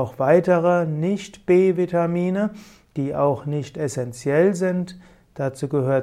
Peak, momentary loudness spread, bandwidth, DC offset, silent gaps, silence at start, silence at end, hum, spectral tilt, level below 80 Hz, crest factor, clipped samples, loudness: -4 dBFS; 11 LU; 13 kHz; under 0.1%; none; 0 s; 0 s; none; -7.5 dB/octave; -58 dBFS; 16 dB; under 0.1%; -21 LUFS